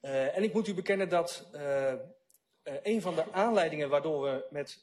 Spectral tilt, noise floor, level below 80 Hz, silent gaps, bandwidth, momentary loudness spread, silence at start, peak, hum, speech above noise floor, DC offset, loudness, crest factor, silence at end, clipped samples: -5.5 dB/octave; -70 dBFS; -78 dBFS; none; 13 kHz; 11 LU; 0.05 s; -16 dBFS; none; 39 dB; under 0.1%; -32 LUFS; 16 dB; 0.1 s; under 0.1%